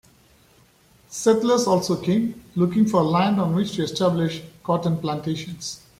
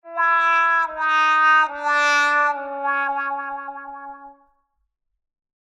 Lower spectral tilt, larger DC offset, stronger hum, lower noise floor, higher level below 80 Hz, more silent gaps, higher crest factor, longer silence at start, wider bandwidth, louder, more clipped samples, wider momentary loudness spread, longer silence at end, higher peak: first, -6 dB/octave vs 1 dB/octave; neither; neither; second, -56 dBFS vs -73 dBFS; first, -58 dBFS vs -68 dBFS; neither; about the same, 18 dB vs 14 dB; first, 1.1 s vs 0.05 s; first, 15.5 kHz vs 12 kHz; second, -22 LUFS vs -18 LUFS; neither; second, 10 LU vs 18 LU; second, 0.2 s vs 1.35 s; about the same, -6 dBFS vs -8 dBFS